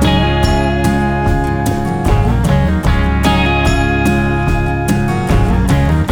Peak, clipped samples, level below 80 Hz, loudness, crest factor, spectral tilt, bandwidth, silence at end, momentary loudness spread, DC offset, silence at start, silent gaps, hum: 0 dBFS; under 0.1%; -18 dBFS; -14 LUFS; 12 dB; -6.5 dB/octave; 18.5 kHz; 0 s; 3 LU; under 0.1%; 0 s; none; none